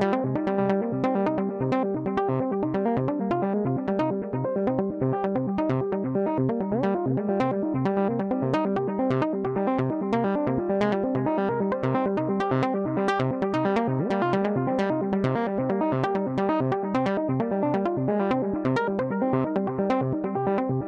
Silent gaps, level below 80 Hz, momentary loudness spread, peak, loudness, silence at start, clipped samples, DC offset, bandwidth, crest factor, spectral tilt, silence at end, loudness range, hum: none; -58 dBFS; 2 LU; -10 dBFS; -26 LUFS; 0 s; under 0.1%; under 0.1%; 8 kHz; 14 dB; -9 dB/octave; 0 s; 1 LU; none